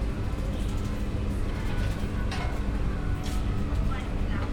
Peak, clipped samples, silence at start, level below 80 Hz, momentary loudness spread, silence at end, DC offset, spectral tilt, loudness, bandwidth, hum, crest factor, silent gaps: -16 dBFS; under 0.1%; 0 s; -30 dBFS; 2 LU; 0 s; under 0.1%; -6.5 dB/octave; -31 LUFS; 13.5 kHz; none; 12 dB; none